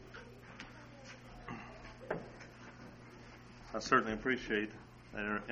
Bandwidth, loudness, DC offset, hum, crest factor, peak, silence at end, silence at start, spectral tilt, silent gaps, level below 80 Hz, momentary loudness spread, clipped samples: 9.2 kHz; -37 LUFS; under 0.1%; 60 Hz at -60 dBFS; 28 dB; -14 dBFS; 0 s; 0 s; -4.5 dB/octave; none; -60 dBFS; 23 LU; under 0.1%